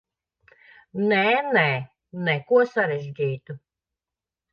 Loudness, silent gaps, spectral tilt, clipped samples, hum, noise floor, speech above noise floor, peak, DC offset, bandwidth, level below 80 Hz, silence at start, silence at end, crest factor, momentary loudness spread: -22 LUFS; none; -7.5 dB/octave; under 0.1%; none; -89 dBFS; 67 dB; -6 dBFS; under 0.1%; 6.8 kHz; -70 dBFS; 0.95 s; 0.95 s; 20 dB; 17 LU